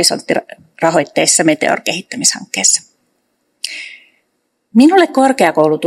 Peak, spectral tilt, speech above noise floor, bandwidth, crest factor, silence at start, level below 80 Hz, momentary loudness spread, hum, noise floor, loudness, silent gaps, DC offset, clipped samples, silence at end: 0 dBFS; -2.5 dB/octave; 54 dB; over 20 kHz; 14 dB; 0 s; -64 dBFS; 15 LU; none; -67 dBFS; -12 LUFS; none; under 0.1%; 0.2%; 0 s